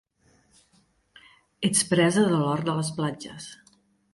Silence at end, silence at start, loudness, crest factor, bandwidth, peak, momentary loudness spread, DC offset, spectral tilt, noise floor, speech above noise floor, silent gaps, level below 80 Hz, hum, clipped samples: 0.6 s; 1.6 s; -24 LUFS; 18 dB; 11.5 kHz; -8 dBFS; 18 LU; under 0.1%; -4.5 dB/octave; -65 dBFS; 41 dB; none; -64 dBFS; none; under 0.1%